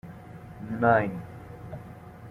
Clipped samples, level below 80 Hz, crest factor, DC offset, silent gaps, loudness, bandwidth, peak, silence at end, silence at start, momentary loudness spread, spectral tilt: under 0.1%; -56 dBFS; 22 dB; under 0.1%; none; -25 LUFS; 14.5 kHz; -8 dBFS; 0 s; 0.05 s; 22 LU; -9 dB/octave